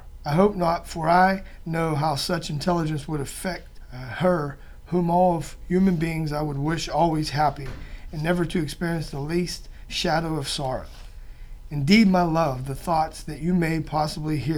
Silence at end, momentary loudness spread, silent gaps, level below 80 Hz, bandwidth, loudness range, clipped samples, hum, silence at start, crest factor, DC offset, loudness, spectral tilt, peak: 0 s; 13 LU; none; -40 dBFS; 18 kHz; 4 LU; under 0.1%; none; 0 s; 20 dB; under 0.1%; -24 LUFS; -6 dB/octave; -4 dBFS